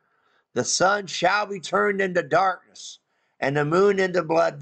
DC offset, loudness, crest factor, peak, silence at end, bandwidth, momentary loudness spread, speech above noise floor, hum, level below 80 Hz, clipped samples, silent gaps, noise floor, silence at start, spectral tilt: under 0.1%; -22 LUFS; 14 dB; -10 dBFS; 0 s; 9.2 kHz; 13 LU; 44 dB; none; -64 dBFS; under 0.1%; none; -66 dBFS; 0.55 s; -4 dB/octave